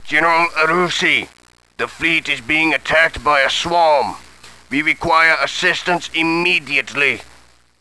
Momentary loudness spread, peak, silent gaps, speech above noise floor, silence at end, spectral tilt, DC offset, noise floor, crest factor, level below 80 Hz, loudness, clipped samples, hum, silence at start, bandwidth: 7 LU; 0 dBFS; none; 33 dB; 0.55 s; -3 dB/octave; under 0.1%; -49 dBFS; 16 dB; -48 dBFS; -15 LUFS; under 0.1%; none; 0 s; 11 kHz